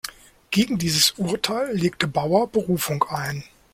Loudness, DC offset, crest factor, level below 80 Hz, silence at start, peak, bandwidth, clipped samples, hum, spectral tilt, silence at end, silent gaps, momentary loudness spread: -22 LUFS; under 0.1%; 20 dB; -54 dBFS; 0.05 s; -4 dBFS; 16.5 kHz; under 0.1%; none; -4 dB/octave; 0.3 s; none; 9 LU